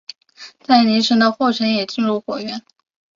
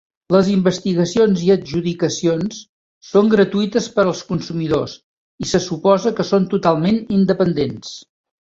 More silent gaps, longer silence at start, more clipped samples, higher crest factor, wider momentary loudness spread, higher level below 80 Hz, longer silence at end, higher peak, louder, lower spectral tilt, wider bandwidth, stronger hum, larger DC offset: second, none vs 2.69-3.01 s, 5.03-5.38 s; about the same, 0.4 s vs 0.3 s; neither; about the same, 16 dB vs 16 dB; first, 19 LU vs 9 LU; second, -64 dBFS vs -50 dBFS; about the same, 0.55 s vs 0.45 s; about the same, -2 dBFS vs -2 dBFS; about the same, -17 LUFS vs -17 LUFS; second, -4.5 dB/octave vs -6 dB/octave; about the same, 7.4 kHz vs 7.8 kHz; neither; neither